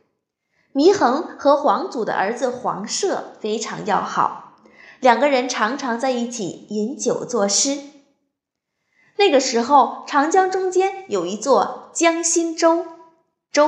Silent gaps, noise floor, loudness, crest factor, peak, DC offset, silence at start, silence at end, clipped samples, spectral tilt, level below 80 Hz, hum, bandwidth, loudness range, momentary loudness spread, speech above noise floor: none; -80 dBFS; -19 LUFS; 18 dB; -2 dBFS; under 0.1%; 0.75 s; 0 s; under 0.1%; -2.5 dB/octave; -74 dBFS; none; 11.5 kHz; 4 LU; 10 LU; 61 dB